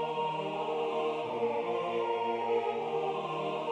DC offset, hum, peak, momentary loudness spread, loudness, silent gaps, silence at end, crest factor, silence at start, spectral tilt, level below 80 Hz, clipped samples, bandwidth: under 0.1%; none; -20 dBFS; 3 LU; -33 LUFS; none; 0 s; 12 dB; 0 s; -6 dB/octave; -78 dBFS; under 0.1%; 9.2 kHz